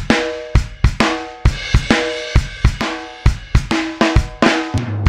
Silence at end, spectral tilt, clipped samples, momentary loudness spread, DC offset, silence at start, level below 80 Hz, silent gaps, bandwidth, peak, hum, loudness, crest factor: 0 s; -5.5 dB/octave; under 0.1%; 5 LU; 0.3%; 0 s; -20 dBFS; none; 11.5 kHz; 0 dBFS; none; -17 LUFS; 16 dB